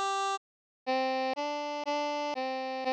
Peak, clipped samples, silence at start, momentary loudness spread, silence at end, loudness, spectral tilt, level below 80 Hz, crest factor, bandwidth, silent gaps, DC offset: -22 dBFS; under 0.1%; 0 s; 4 LU; 0 s; -33 LUFS; -1 dB/octave; -88 dBFS; 12 dB; 11 kHz; 0.37-0.86 s; under 0.1%